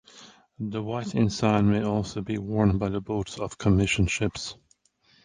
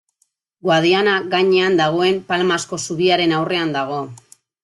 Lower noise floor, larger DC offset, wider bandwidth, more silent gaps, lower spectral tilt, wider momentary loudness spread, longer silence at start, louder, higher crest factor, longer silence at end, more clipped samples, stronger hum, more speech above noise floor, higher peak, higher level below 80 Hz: about the same, -64 dBFS vs -67 dBFS; neither; second, 9.8 kHz vs 11.5 kHz; neither; first, -6 dB/octave vs -4.5 dB/octave; about the same, 11 LU vs 10 LU; second, 0.15 s vs 0.65 s; second, -26 LUFS vs -17 LUFS; about the same, 18 dB vs 14 dB; first, 0.7 s vs 0.45 s; neither; neither; second, 39 dB vs 50 dB; second, -8 dBFS vs -4 dBFS; first, -42 dBFS vs -62 dBFS